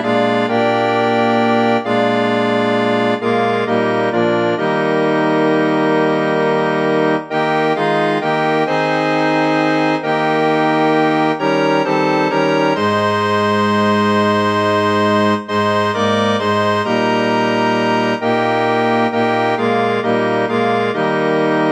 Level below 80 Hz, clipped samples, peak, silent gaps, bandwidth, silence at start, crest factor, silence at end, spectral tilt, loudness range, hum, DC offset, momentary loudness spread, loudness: -62 dBFS; under 0.1%; -2 dBFS; none; 13.5 kHz; 0 s; 14 dB; 0 s; -6 dB/octave; 1 LU; none; under 0.1%; 2 LU; -15 LUFS